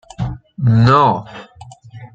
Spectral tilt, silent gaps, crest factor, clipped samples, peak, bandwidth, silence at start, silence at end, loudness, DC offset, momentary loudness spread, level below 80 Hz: -8 dB/octave; none; 16 dB; under 0.1%; -2 dBFS; 7.6 kHz; 0.2 s; 0.1 s; -14 LUFS; under 0.1%; 21 LU; -40 dBFS